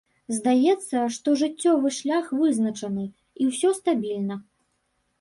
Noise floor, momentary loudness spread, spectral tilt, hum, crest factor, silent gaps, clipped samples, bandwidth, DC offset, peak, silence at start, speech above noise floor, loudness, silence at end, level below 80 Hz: -72 dBFS; 10 LU; -5 dB/octave; none; 14 dB; none; under 0.1%; 11.5 kHz; under 0.1%; -10 dBFS; 0.3 s; 49 dB; -24 LUFS; 0.8 s; -70 dBFS